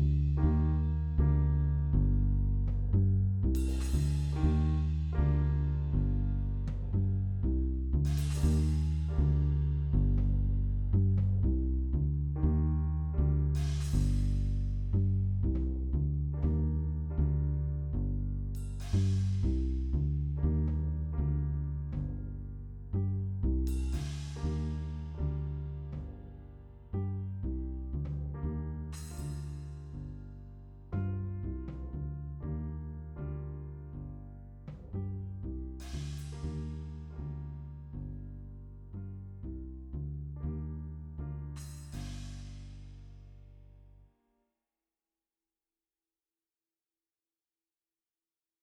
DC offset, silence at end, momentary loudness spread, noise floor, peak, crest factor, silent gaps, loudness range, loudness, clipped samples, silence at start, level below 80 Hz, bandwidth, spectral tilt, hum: under 0.1%; 4.8 s; 15 LU; under -90 dBFS; -16 dBFS; 16 dB; none; 12 LU; -33 LUFS; under 0.1%; 0 s; -36 dBFS; 11 kHz; -8.5 dB/octave; none